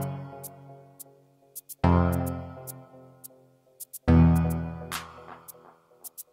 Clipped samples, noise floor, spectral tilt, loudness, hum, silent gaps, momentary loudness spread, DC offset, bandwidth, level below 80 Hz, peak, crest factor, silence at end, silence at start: under 0.1%; -59 dBFS; -7 dB/octave; -26 LUFS; none; none; 26 LU; under 0.1%; 16 kHz; -38 dBFS; -6 dBFS; 22 dB; 0.1 s; 0 s